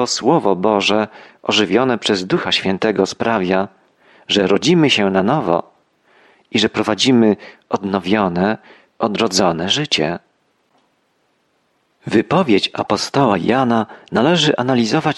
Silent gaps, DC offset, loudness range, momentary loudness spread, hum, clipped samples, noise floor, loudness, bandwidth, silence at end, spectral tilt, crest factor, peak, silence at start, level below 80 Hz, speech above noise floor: none; under 0.1%; 4 LU; 8 LU; none; under 0.1%; -63 dBFS; -16 LUFS; 12 kHz; 0 s; -4.5 dB/octave; 16 dB; -2 dBFS; 0 s; -56 dBFS; 47 dB